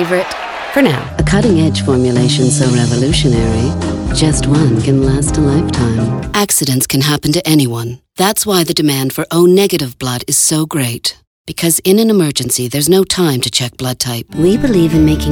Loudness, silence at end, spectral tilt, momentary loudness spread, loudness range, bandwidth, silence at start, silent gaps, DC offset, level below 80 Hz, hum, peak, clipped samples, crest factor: -12 LUFS; 0 s; -4.5 dB/octave; 7 LU; 1 LU; over 20 kHz; 0 s; 11.27-11.45 s; under 0.1%; -30 dBFS; none; 0 dBFS; under 0.1%; 12 dB